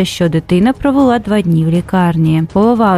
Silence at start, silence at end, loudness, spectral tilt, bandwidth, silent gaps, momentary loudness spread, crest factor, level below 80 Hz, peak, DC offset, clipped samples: 0 s; 0 s; -12 LUFS; -7.5 dB/octave; 14 kHz; none; 2 LU; 12 dB; -36 dBFS; 0 dBFS; under 0.1%; under 0.1%